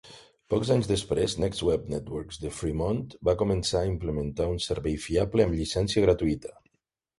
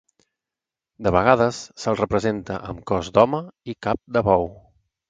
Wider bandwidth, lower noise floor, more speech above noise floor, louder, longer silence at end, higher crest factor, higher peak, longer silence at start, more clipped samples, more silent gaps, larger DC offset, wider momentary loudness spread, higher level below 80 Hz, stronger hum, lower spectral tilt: first, 11.5 kHz vs 9.2 kHz; second, -78 dBFS vs -88 dBFS; second, 52 dB vs 67 dB; second, -28 LUFS vs -22 LUFS; first, 0.65 s vs 0.5 s; about the same, 20 dB vs 22 dB; second, -8 dBFS vs 0 dBFS; second, 0.05 s vs 1 s; neither; neither; neither; about the same, 10 LU vs 12 LU; about the same, -42 dBFS vs -44 dBFS; neither; about the same, -6 dB/octave vs -6 dB/octave